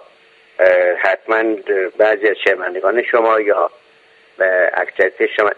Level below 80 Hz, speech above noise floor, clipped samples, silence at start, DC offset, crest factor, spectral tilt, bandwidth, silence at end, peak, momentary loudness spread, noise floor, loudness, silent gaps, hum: -64 dBFS; 34 dB; under 0.1%; 0.6 s; under 0.1%; 16 dB; -4.5 dB/octave; 7.4 kHz; 0.05 s; 0 dBFS; 5 LU; -50 dBFS; -15 LUFS; none; none